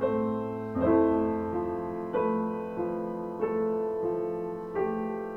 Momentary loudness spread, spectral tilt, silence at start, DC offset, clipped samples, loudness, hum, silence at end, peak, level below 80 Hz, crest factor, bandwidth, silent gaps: 8 LU; -9.5 dB/octave; 0 s; under 0.1%; under 0.1%; -30 LUFS; none; 0 s; -12 dBFS; -56 dBFS; 18 dB; 5.2 kHz; none